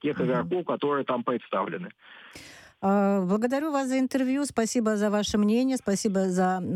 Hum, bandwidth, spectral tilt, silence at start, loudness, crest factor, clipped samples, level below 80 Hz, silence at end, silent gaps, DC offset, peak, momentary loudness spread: none; 13.5 kHz; -5.5 dB/octave; 0.05 s; -26 LUFS; 14 dB; under 0.1%; -60 dBFS; 0 s; none; under 0.1%; -12 dBFS; 9 LU